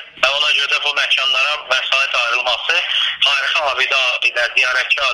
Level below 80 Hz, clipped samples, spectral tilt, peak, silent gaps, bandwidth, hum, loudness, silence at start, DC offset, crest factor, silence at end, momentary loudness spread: -56 dBFS; under 0.1%; 2 dB/octave; 0 dBFS; none; 14 kHz; none; -14 LUFS; 0 s; under 0.1%; 16 dB; 0 s; 3 LU